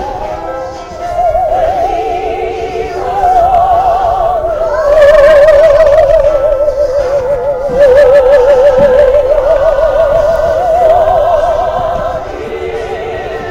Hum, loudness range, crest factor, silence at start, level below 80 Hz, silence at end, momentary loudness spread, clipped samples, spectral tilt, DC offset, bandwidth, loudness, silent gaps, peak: none; 5 LU; 8 dB; 0 s; -26 dBFS; 0 s; 14 LU; 0.7%; -5.5 dB/octave; under 0.1%; 11 kHz; -9 LUFS; none; 0 dBFS